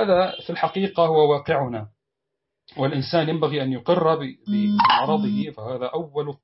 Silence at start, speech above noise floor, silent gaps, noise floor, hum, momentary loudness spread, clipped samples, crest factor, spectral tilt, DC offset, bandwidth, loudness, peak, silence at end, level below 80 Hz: 0 s; 60 dB; none; -82 dBFS; none; 11 LU; under 0.1%; 16 dB; -10 dB/octave; under 0.1%; 5.8 kHz; -22 LUFS; -6 dBFS; 0.1 s; -60 dBFS